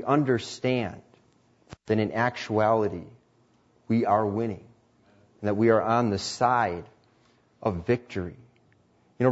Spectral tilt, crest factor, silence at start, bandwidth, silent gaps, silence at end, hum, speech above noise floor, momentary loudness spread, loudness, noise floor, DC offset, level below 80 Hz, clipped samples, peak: -6.5 dB/octave; 20 dB; 0 s; 8 kHz; none; 0 s; none; 38 dB; 13 LU; -26 LUFS; -64 dBFS; under 0.1%; -60 dBFS; under 0.1%; -8 dBFS